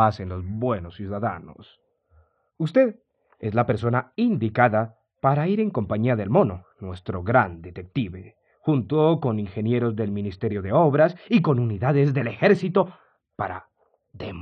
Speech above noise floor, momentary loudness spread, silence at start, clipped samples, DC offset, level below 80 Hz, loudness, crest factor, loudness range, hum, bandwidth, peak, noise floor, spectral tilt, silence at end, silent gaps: 38 dB; 13 LU; 0 s; under 0.1%; under 0.1%; -60 dBFS; -23 LUFS; 20 dB; 5 LU; none; 6.6 kHz; -4 dBFS; -61 dBFS; -9.5 dB/octave; 0 s; none